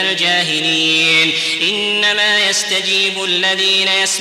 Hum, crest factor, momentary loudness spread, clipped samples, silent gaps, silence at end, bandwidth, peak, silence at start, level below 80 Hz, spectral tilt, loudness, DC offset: none; 10 dB; 4 LU; under 0.1%; none; 0 s; 16.5 kHz; -4 dBFS; 0 s; -62 dBFS; -1 dB/octave; -12 LUFS; under 0.1%